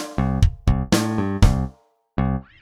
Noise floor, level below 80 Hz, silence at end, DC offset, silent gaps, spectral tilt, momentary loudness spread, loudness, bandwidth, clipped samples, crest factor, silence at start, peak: -50 dBFS; -24 dBFS; 0.2 s; under 0.1%; none; -6 dB/octave; 7 LU; -22 LUFS; 15.5 kHz; under 0.1%; 20 dB; 0 s; 0 dBFS